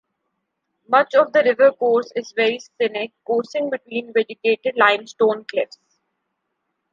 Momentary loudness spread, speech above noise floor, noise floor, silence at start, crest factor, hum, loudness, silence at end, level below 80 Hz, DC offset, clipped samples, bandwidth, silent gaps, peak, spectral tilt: 10 LU; 57 dB; -76 dBFS; 0.9 s; 18 dB; none; -19 LUFS; 1.25 s; -78 dBFS; under 0.1%; under 0.1%; 7.4 kHz; none; -2 dBFS; -4 dB/octave